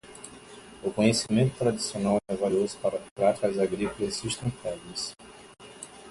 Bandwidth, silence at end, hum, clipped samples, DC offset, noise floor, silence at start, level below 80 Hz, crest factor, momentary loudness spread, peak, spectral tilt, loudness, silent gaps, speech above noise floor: 11.5 kHz; 0 s; none; under 0.1%; under 0.1%; -48 dBFS; 0.05 s; -56 dBFS; 20 dB; 21 LU; -8 dBFS; -5 dB/octave; -28 LUFS; 3.11-3.16 s; 21 dB